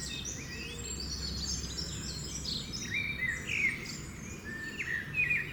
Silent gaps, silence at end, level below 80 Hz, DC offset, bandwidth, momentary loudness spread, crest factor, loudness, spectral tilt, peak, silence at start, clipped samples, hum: none; 0 s; -48 dBFS; under 0.1%; over 20 kHz; 10 LU; 16 dB; -35 LUFS; -2 dB/octave; -20 dBFS; 0 s; under 0.1%; none